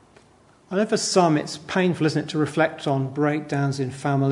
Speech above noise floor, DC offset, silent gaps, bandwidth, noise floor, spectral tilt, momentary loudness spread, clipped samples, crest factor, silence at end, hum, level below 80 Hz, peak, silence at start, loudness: 33 dB; under 0.1%; none; 11 kHz; -55 dBFS; -5.5 dB/octave; 7 LU; under 0.1%; 18 dB; 0 s; none; -66 dBFS; -4 dBFS; 0.7 s; -23 LUFS